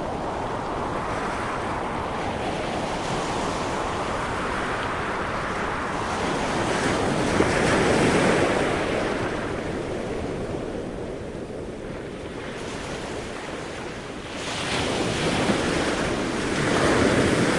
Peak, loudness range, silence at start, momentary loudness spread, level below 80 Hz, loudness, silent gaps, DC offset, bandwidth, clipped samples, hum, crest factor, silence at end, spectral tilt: -6 dBFS; 10 LU; 0 s; 13 LU; -42 dBFS; -25 LUFS; none; under 0.1%; 11.5 kHz; under 0.1%; none; 18 dB; 0 s; -4.5 dB/octave